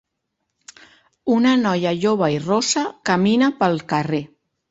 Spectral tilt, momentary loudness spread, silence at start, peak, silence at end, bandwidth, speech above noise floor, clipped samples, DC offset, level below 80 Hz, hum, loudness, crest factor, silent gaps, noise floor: -5 dB/octave; 6 LU; 1.25 s; -4 dBFS; 0.45 s; 8 kHz; 58 dB; under 0.1%; under 0.1%; -60 dBFS; none; -19 LUFS; 18 dB; none; -76 dBFS